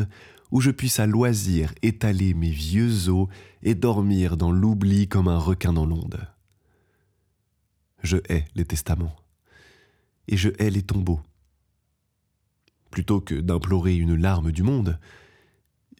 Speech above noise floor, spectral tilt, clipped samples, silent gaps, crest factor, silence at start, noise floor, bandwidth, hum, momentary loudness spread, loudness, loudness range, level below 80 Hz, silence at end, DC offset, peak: 51 dB; -6.5 dB/octave; under 0.1%; none; 16 dB; 0 s; -73 dBFS; 16.5 kHz; none; 9 LU; -23 LUFS; 8 LU; -36 dBFS; 1 s; under 0.1%; -8 dBFS